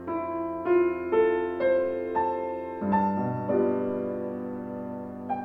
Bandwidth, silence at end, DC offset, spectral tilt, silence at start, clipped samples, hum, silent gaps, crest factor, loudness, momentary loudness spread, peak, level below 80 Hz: 4.6 kHz; 0 s; under 0.1%; -10 dB/octave; 0 s; under 0.1%; none; none; 16 dB; -28 LUFS; 11 LU; -12 dBFS; -62 dBFS